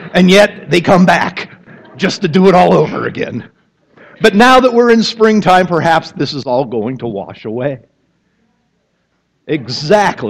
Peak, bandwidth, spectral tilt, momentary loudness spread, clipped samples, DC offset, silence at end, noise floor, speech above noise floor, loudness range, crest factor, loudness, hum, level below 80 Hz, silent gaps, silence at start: 0 dBFS; 13.5 kHz; -5.5 dB/octave; 14 LU; 0.1%; under 0.1%; 0 s; -62 dBFS; 52 dB; 10 LU; 12 dB; -11 LUFS; none; -46 dBFS; none; 0 s